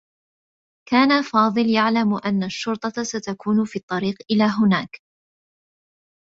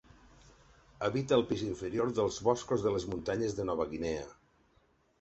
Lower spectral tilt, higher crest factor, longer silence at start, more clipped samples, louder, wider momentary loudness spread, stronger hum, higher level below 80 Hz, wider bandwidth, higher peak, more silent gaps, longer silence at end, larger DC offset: about the same, -5.5 dB/octave vs -5.5 dB/octave; about the same, 20 dB vs 20 dB; about the same, 0.9 s vs 1 s; neither; first, -20 LUFS vs -33 LUFS; about the same, 8 LU vs 7 LU; neither; second, -64 dBFS vs -58 dBFS; about the same, 7.8 kHz vs 8.2 kHz; first, -2 dBFS vs -14 dBFS; first, 3.83-3.88 s vs none; first, 1.25 s vs 0.85 s; neither